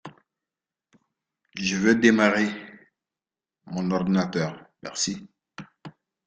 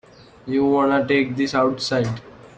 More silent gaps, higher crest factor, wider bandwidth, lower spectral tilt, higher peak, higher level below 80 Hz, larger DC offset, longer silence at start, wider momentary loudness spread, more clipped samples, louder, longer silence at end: neither; first, 24 dB vs 14 dB; about the same, 9.4 kHz vs 9 kHz; second, -4.5 dB/octave vs -6 dB/octave; about the same, -4 dBFS vs -6 dBFS; second, -64 dBFS vs -56 dBFS; neither; second, 0.05 s vs 0.45 s; first, 25 LU vs 9 LU; neither; second, -24 LUFS vs -20 LUFS; first, 0.35 s vs 0.1 s